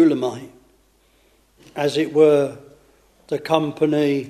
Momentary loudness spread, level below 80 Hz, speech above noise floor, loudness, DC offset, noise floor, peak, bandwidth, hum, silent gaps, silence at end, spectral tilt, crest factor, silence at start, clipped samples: 14 LU; -62 dBFS; 40 dB; -20 LUFS; under 0.1%; -58 dBFS; -2 dBFS; 13 kHz; none; none; 0 s; -6.5 dB/octave; 20 dB; 0 s; under 0.1%